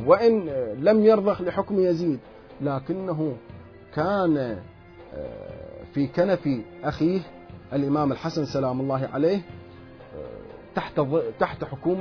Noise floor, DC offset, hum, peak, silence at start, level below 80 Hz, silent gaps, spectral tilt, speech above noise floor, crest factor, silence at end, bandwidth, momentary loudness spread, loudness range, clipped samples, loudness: -45 dBFS; under 0.1%; none; -4 dBFS; 0 s; -54 dBFS; none; -8.5 dB/octave; 21 dB; 20 dB; 0 s; 5.4 kHz; 20 LU; 5 LU; under 0.1%; -25 LUFS